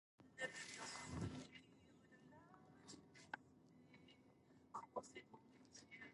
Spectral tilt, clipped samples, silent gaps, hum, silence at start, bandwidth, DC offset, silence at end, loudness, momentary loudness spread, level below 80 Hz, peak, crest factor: -4 dB/octave; under 0.1%; none; none; 0.2 s; 11.5 kHz; under 0.1%; 0 s; -55 LUFS; 17 LU; -74 dBFS; -34 dBFS; 24 dB